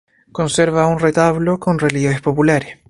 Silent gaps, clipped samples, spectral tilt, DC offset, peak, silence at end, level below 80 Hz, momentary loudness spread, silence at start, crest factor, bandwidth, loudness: none; under 0.1%; -6 dB/octave; under 0.1%; 0 dBFS; 0.15 s; -44 dBFS; 4 LU; 0.35 s; 16 dB; 11.5 kHz; -16 LUFS